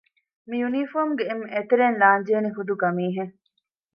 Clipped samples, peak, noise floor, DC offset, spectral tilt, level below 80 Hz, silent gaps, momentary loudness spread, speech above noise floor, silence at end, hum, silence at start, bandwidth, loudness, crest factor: under 0.1%; -4 dBFS; -74 dBFS; under 0.1%; -9 dB/octave; -78 dBFS; none; 11 LU; 52 dB; 0.65 s; none; 0.5 s; 5.4 kHz; -23 LUFS; 20 dB